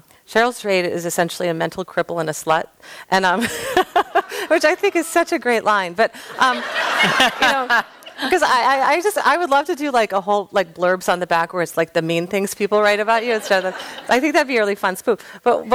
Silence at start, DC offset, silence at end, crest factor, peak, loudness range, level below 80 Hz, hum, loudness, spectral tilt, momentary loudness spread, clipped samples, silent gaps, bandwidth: 0.3 s; under 0.1%; 0 s; 14 dB; -4 dBFS; 4 LU; -58 dBFS; none; -18 LUFS; -3.5 dB/octave; 7 LU; under 0.1%; none; 17 kHz